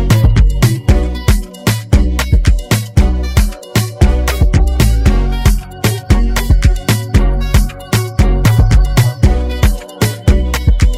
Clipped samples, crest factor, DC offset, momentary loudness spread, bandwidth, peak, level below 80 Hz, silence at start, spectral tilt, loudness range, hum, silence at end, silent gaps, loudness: under 0.1%; 10 dB; 0.2%; 5 LU; 16 kHz; 0 dBFS; -12 dBFS; 0 s; -5.5 dB/octave; 1 LU; none; 0 s; none; -13 LUFS